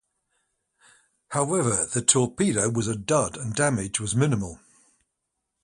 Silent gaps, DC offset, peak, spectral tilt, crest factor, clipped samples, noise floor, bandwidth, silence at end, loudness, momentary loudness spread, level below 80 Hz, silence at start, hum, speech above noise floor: none; under 0.1%; -4 dBFS; -4 dB/octave; 24 dB; under 0.1%; -81 dBFS; 11.5 kHz; 1.1 s; -24 LUFS; 8 LU; -54 dBFS; 1.3 s; none; 56 dB